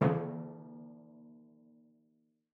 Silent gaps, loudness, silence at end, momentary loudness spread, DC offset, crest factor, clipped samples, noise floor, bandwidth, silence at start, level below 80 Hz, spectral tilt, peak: none; -39 LUFS; 1.2 s; 24 LU; under 0.1%; 24 dB; under 0.1%; -74 dBFS; 4.5 kHz; 0 s; -80 dBFS; -10.5 dB/octave; -14 dBFS